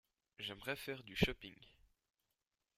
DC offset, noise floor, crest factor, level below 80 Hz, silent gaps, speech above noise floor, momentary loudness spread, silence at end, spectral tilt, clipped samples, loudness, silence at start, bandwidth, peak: under 0.1%; -90 dBFS; 30 dB; -58 dBFS; none; 47 dB; 13 LU; 1.1 s; -5 dB/octave; under 0.1%; -42 LUFS; 0.4 s; 15.5 kHz; -16 dBFS